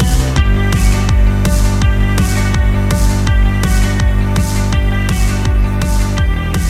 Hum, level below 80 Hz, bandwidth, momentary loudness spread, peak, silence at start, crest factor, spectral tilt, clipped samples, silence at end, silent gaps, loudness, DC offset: none; -14 dBFS; 15 kHz; 2 LU; 0 dBFS; 0 s; 10 dB; -5.5 dB/octave; under 0.1%; 0 s; none; -14 LUFS; under 0.1%